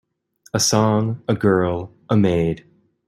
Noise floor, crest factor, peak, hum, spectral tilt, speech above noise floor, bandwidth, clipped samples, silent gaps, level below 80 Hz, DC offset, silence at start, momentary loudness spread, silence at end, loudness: -56 dBFS; 18 dB; -2 dBFS; none; -5 dB/octave; 38 dB; 15 kHz; under 0.1%; none; -50 dBFS; under 0.1%; 0.55 s; 10 LU; 0.5 s; -19 LUFS